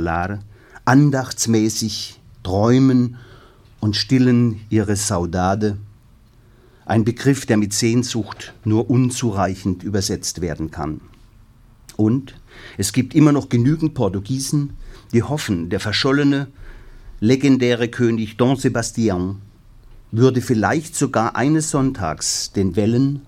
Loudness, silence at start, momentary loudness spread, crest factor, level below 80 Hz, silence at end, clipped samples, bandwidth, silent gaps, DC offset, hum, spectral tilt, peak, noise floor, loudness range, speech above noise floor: -19 LUFS; 0 s; 11 LU; 18 dB; -44 dBFS; 0.05 s; under 0.1%; 16 kHz; none; under 0.1%; none; -5.5 dB/octave; 0 dBFS; -49 dBFS; 3 LU; 31 dB